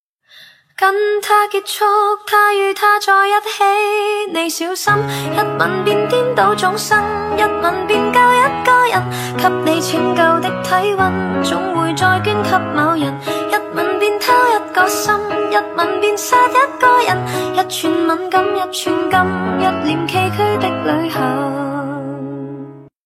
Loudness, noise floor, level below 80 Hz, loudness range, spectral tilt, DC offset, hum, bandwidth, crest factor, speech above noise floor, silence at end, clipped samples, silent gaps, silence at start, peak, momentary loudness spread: -15 LUFS; -44 dBFS; -52 dBFS; 3 LU; -4 dB/octave; under 0.1%; none; 16 kHz; 16 dB; 30 dB; 0.2 s; under 0.1%; none; 0.35 s; 0 dBFS; 7 LU